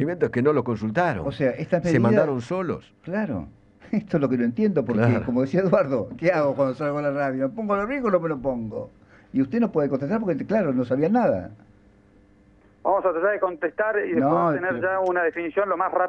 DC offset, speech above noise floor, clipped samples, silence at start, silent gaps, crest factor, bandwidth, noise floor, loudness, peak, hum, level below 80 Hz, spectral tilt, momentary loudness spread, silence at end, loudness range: under 0.1%; 32 dB; under 0.1%; 0 s; none; 18 dB; 8.8 kHz; -55 dBFS; -23 LUFS; -6 dBFS; none; -54 dBFS; -8.5 dB/octave; 9 LU; 0 s; 3 LU